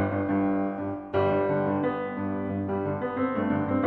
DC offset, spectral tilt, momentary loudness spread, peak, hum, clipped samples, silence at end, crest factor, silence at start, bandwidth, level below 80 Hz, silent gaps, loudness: under 0.1%; -10.5 dB/octave; 6 LU; -12 dBFS; none; under 0.1%; 0 s; 14 dB; 0 s; 4.5 kHz; -60 dBFS; none; -28 LUFS